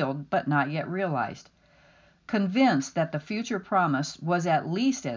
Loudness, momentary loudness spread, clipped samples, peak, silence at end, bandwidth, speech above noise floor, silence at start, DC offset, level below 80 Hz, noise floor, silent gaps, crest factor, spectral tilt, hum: -27 LUFS; 8 LU; under 0.1%; -12 dBFS; 0 s; 7.6 kHz; 33 dB; 0 s; under 0.1%; -68 dBFS; -59 dBFS; none; 16 dB; -6 dB/octave; none